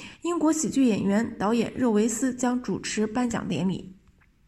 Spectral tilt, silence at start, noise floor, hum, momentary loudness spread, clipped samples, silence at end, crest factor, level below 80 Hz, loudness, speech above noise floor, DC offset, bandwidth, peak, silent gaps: -5 dB/octave; 0 s; -59 dBFS; none; 6 LU; under 0.1%; 0.55 s; 14 dB; -56 dBFS; -25 LUFS; 34 dB; under 0.1%; 14.5 kHz; -12 dBFS; none